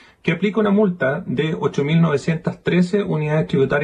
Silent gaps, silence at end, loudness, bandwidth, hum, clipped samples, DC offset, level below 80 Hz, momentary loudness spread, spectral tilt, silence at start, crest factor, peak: none; 0 s; -19 LUFS; 9.6 kHz; none; under 0.1%; under 0.1%; -52 dBFS; 5 LU; -7.5 dB/octave; 0.25 s; 14 dB; -6 dBFS